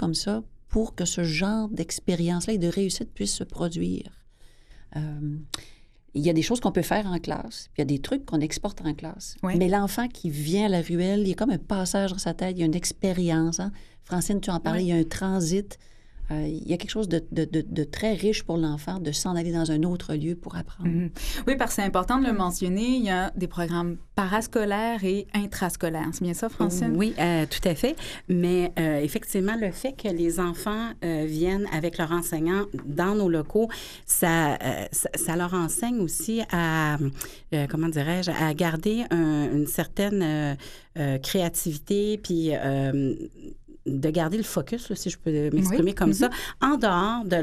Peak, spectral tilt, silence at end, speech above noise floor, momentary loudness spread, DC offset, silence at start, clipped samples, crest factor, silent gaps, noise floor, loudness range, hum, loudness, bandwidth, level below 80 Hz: -8 dBFS; -5 dB/octave; 0 s; 25 dB; 7 LU; under 0.1%; 0 s; under 0.1%; 18 dB; none; -51 dBFS; 3 LU; none; -26 LUFS; 15 kHz; -42 dBFS